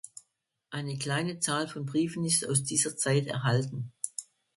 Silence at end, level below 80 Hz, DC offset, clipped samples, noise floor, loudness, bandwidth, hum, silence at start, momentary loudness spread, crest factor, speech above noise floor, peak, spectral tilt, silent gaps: 0.35 s; -68 dBFS; under 0.1%; under 0.1%; -79 dBFS; -29 LUFS; 12 kHz; none; 0.05 s; 11 LU; 20 dB; 49 dB; -12 dBFS; -4 dB/octave; none